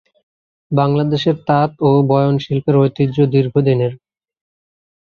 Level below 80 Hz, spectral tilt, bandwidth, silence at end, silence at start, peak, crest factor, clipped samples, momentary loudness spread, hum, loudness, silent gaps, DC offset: -54 dBFS; -9 dB/octave; 6.6 kHz; 1.2 s; 0.7 s; -2 dBFS; 14 dB; under 0.1%; 4 LU; none; -15 LUFS; none; under 0.1%